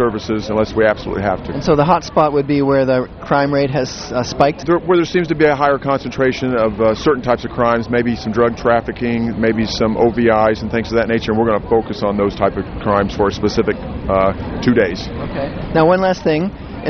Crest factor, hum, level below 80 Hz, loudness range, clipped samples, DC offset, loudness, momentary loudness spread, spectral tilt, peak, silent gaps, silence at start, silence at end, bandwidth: 16 dB; none; -36 dBFS; 2 LU; under 0.1%; under 0.1%; -16 LUFS; 6 LU; -6.5 dB/octave; 0 dBFS; none; 0 s; 0 s; 6.6 kHz